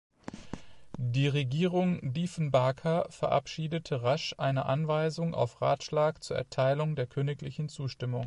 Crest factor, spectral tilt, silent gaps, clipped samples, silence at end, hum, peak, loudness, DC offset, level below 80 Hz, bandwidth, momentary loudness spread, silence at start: 18 dB; -6.5 dB/octave; none; under 0.1%; 0 s; none; -14 dBFS; -31 LUFS; under 0.1%; -60 dBFS; 11 kHz; 9 LU; 0.25 s